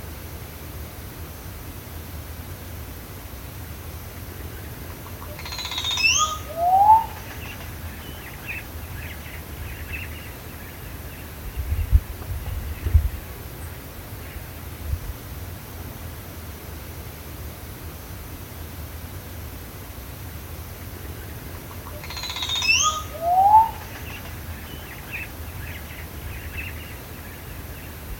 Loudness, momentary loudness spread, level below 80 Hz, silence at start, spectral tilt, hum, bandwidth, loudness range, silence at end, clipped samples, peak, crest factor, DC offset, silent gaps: -27 LUFS; 18 LU; -34 dBFS; 0 s; -3 dB/octave; none; 17 kHz; 15 LU; 0 s; under 0.1%; -4 dBFS; 24 dB; under 0.1%; none